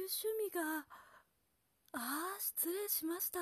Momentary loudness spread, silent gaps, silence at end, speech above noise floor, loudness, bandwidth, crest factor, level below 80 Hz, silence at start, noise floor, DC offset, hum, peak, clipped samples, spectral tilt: 11 LU; none; 0 s; 39 dB; -39 LUFS; 14 kHz; 18 dB; -84 dBFS; 0 s; -80 dBFS; under 0.1%; none; -24 dBFS; under 0.1%; -0.5 dB/octave